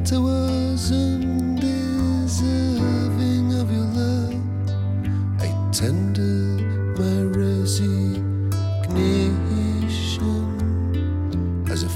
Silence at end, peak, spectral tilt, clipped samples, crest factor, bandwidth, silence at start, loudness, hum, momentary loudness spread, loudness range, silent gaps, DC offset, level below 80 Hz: 0 s; -8 dBFS; -6.5 dB/octave; under 0.1%; 12 dB; 14.5 kHz; 0 s; -22 LUFS; none; 3 LU; 1 LU; none; under 0.1%; -36 dBFS